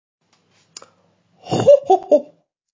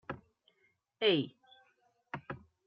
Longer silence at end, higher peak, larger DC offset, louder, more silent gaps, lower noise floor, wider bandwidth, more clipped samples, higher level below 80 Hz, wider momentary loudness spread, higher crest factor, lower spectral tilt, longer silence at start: first, 0.5 s vs 0.3 s; first, -2 dBFS vs -16 dBFS; neither; first, -15 LUFS vs -33 LUFS; neither; second, -60 dBFS vs -76 dBFS; first, 7.6 kHz vs 5.4 kHz; neither; first, -60 dBFS vs -74 dBFS; second, 6 LU vs 18 LU; about the same, 18 dB vs 22 dB; first, -6.5 dB/octave vs -3 dB/octave; first, 1.45 s vs 0.1 s